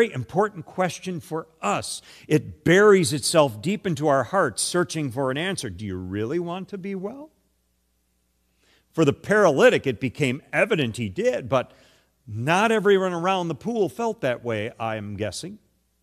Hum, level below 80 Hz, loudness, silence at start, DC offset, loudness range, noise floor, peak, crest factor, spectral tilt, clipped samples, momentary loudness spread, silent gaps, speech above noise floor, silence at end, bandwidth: none; -60 dBFS; -23 LUFS; 0 s; under 0.1%; 9 LU; -69 dBFS; -2 dBFS; 20 dB; -5 dB/octave; under 0.1%; 14 LU; none; 46 dB; 0.45 s; 15 kHz